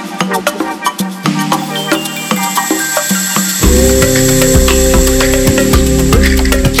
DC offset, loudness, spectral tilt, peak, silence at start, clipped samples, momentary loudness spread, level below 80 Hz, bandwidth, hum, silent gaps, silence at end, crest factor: under 0.1%; -11 LUFS; -4 dB/octave; 0 dBFS; 0 s; under 0.1%; 7 LU; -16 dBFS; over 20 kHz; none; none; 0 s; 10 dB